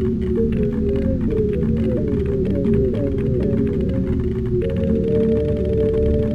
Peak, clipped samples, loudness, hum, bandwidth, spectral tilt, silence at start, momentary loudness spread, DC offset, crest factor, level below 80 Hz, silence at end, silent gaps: -6 dBFS; under 0.1%; -20 LUFS; none; 5.6 kHz; -10.5 dB/octave; 0 s; 3 LU; 0.9%; 12 dB; -28 dBFS; 0 s; none